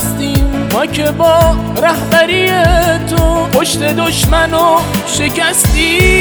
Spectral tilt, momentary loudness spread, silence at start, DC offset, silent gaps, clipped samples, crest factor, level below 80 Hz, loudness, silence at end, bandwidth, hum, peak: -4 dB/octave; 5 LU; 0 s; under 0.1%; none; under 0.1%; 10 dB; -20 dBFS; -11 LUFS; 0 s; over 20 kHz; none; 0 dBFS